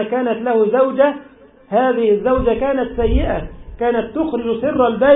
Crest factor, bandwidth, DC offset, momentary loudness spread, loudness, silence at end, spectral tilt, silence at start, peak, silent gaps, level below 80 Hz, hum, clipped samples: 16 dB; 4 kHz; under 0.1%; 7 LU; -17 LUFS; 0 s; -12 dB/octave; 0 s; -2 dBFS; none; -30 dBFS; none; under 0.1%